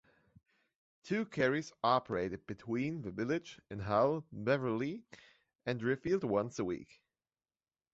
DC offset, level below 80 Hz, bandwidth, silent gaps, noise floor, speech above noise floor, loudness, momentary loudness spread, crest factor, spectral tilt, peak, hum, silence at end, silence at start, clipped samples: under 0.1%; -66 dBFS; 8 kHz; 5.55-5.59 s; under -90 dBFS; over 55 dB; -36 LUFS; 11 LU; 22 dB; -5 dB/octave; -16 dBFS; none; 1.1 s; 1.05 s; under 0.1%